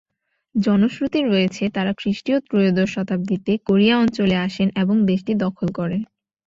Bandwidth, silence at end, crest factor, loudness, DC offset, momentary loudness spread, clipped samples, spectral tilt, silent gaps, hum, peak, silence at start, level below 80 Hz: 7.6 kHz; 0.45 s; 16 dB; -20 LUFS; under 0.1%; 7 LU; under 0.1%; -7 dB/octave; none; none; -4 dBFS; 0.55 s; -54 dBFS